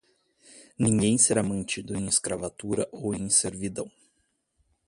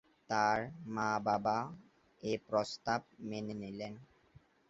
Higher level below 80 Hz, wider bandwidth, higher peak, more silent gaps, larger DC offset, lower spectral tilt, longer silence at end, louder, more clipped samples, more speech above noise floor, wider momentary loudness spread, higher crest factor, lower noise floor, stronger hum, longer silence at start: first, -56 dBFS vs -70 dBFS; first, 11.5 kHz vs 8 kHz; first, -6 dBFS vs -16 dBFS; neither; neither; about the same, -4 dB/octave vs -4 dB/octave; first, 1 s vs 0.3 s; first, -25 LUFS vs -37 LUFS; neither; first, 47 dB vs 29 dB; about the same, 13 LU vs 13 LU; about the same, 22 dB vs 20 dB; first, -73 dBFS vs -65 dBFS; neither; first, 0.55 s vs 0.3 s